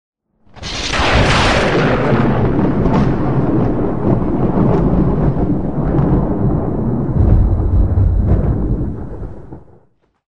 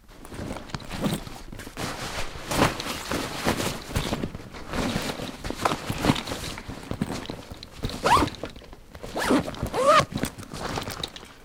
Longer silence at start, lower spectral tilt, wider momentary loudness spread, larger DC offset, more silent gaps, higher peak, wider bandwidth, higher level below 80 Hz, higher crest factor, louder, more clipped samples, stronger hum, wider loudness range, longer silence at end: about the same, 0.1 s vs 0.1 s; first, -7 dB/octave vs -4.5 dB/octave; second, 9 LU vs 17 LU; first, 4% vs under 0.1%; neither; first, 0 dBFS vs -6 dBFS; second, 10.5 kHz vs 18 kHz; first, -20 dBFS vs -42 dBFS; second, 14 dB vs 22 dB; first, -15 LUFS vs -27 LUFS; neither; neither; second, 2 LU vs 5 LU; about the same, 0.05 s vs 0 s